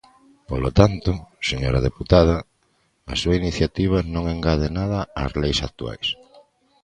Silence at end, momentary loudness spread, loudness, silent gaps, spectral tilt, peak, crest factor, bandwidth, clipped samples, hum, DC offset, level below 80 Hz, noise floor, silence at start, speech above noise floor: 0.7 s; 10 LU; -22 LUFS; none; -6 dB/octave; 0 dBFS; 22 dB; 10 kHz; under 0.1%; none; under 0.1%; -32 dBFS; -65 dBFS; 0.5 s; 45 dB